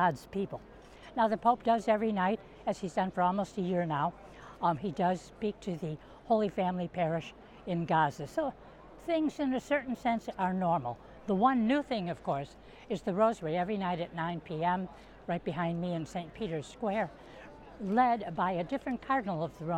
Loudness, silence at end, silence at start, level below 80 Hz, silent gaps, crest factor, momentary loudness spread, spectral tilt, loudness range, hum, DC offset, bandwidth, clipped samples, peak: -32 LUFS; 0 s; 0 s; -60 dBFS; none; 20 dB; 13 LU; -7 dB/octave; 4 LU; none; under 0.1%; 12.5 kHz; under 0.1%; -12 dBFS